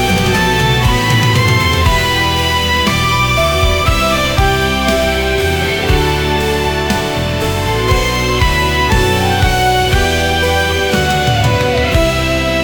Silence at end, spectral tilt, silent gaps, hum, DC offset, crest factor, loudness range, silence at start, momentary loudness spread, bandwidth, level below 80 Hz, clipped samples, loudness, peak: 0 s; -4.5 dB/octave; none; none; under 0.1%; 12 dB; 2 LU; 0 s; 3 LU; 18 kHz; -20 dBFS; under 0.1%; -12 LUFS; 0 dBFS